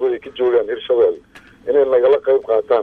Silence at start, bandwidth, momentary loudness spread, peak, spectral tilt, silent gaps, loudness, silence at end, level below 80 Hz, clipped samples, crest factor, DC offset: 0 s; 4.4 kHz; 7 LU; -4 dBFS; -6.5 dB/octave; none; -16 LUFS; 0 s; -56 dBFS; under 0.1%; 12 dB; under 0.1%